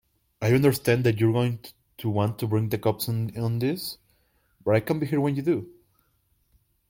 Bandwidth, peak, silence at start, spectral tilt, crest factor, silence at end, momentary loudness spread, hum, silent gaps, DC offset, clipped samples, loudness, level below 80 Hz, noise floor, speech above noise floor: 16.5 kHz; -10 dBFS; 0.4 s; -7 dB/octave; 16 dB; 1.2 s; 11 LU; none; none; under 0.1%; under 0.1%; -25 LUFS; -58 dBFS; -69 dBFS; 45 dB